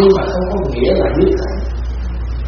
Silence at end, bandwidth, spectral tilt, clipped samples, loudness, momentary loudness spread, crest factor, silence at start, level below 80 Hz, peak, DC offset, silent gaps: 0 s; 6.6 kHz; -6.5 dB/octave; under 0.1%; -16 LUFS; 10 LU; 14 dB; 0 s; -22 dBFS; 0 dBFS; under 0.1%; none